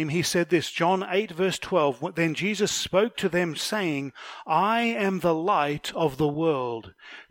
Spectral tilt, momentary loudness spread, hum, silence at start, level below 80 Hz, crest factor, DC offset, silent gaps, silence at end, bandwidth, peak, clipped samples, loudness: -4.5 dB/octave; 6 LU; none; 0 s; -60 dBFS; 18 dB; under 0.1%; none; 0.05 s; 16.5 kHz; -8 dBFS; under 0.1%; -25 LUFS